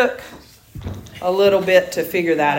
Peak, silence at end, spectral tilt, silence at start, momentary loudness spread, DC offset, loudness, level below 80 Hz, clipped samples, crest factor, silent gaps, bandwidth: -2 dBFS; 0 s; -5 dB/octave; 0 s; 19 LU; under 0.1%; -17 LUFS; -48 dBFS; under 0.1%; 18 dB; none; 16.5 kHz